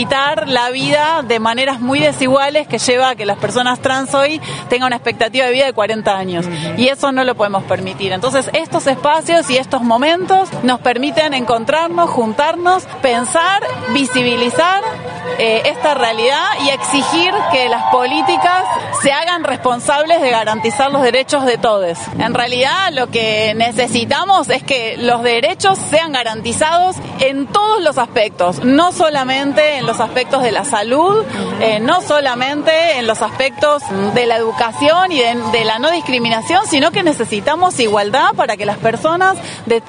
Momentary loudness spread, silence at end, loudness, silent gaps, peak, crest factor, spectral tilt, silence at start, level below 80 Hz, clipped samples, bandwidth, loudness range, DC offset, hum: 4 LU; 0 s; -14 LUFS; none; 0 dBFS; 14 dB; -3.5 dB/octave; 0 s; -54 dBFS; under 0.1%; 11 kHz; 1 LU; under 0.1%; none